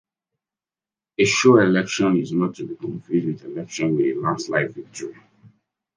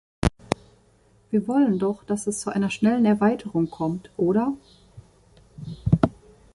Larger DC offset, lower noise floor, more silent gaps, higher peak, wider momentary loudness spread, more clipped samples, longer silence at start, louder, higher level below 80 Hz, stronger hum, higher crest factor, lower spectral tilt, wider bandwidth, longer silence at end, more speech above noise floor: neither; first, under -90 dBFS vs -59 dBFS; neither; about the same, -2 dBFS vs -2 dBFS; first, 19 LU vs 11 LU; neither; first, 1.2 s vs 0.2 s; first, -21 LUFS vs -24 LUFS; second, -64 dBFS vs -42 dBFS; neither; about the same, 20 dB vs 22 dB; second, -5 dB/octave vs -6.5 dB/octave; second, 10 kHz vs 11.5 kHz; about the same, 0.5 s vs 0.45 s; first, over 69 dB vs 36 dB